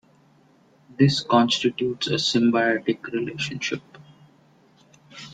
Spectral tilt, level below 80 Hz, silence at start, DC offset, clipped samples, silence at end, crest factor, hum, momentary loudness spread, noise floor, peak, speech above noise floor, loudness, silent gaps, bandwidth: -5 dB/octave; -62 dBFS; 1 s; under 0.1%; under 0.1%; 0 s; 20 dB; none; 10 LU; -57 dBFS; -4 dBFS; 35 dB; -22 LUFS; none; 9.2 kHz